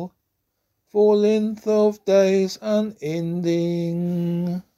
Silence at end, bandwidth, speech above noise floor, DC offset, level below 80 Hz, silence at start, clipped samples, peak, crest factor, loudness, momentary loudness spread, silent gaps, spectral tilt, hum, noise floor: 0.15 s; 13.5 kHz; 54 dB; under 0.1%; -66 dBFS; 0 s; under 0.1%; -6 dBFS; 14 dB; -21 LUFS; 9 LU; none; -7 dB/octave; none; -75 dBFS